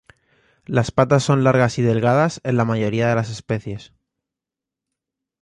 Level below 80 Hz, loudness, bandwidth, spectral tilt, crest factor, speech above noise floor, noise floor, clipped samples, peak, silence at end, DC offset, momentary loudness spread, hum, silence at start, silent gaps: -50 dBFS; -19 LUFS; 11 kHz; -6.5 dB/octave; 18 dB; 68 dB; -87 dBFS; under 0.1%; -2 dBFS; 1.6 s; under 0.1%; 10 LU; none; 0.7 s; none